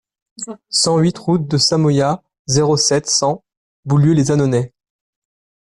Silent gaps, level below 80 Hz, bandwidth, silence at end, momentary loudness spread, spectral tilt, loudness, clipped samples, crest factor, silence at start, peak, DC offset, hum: 2.39-2.45 s, 3.57-3.83 s; -50 dBFS; 11.5 kHz; 1 s; 15 LU; -5 dB/octave; -15 LUFS; under 0.1%; 14 dB; 0.4 s; -4 dBFS; under 0.1%; none